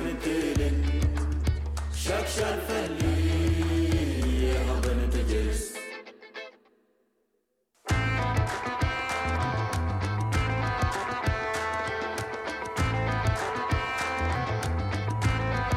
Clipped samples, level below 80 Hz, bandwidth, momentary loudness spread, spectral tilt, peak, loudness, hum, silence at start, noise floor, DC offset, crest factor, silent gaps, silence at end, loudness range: under 0.1%; -32 dBFS; 15.5 kHz; 6 LU; -5.5 dB/octave; -14 dBFS; -28 LUFS; none; 0 s; -75 dBFS; under 0.1%; 14 dB; none; 0 s; 5 LU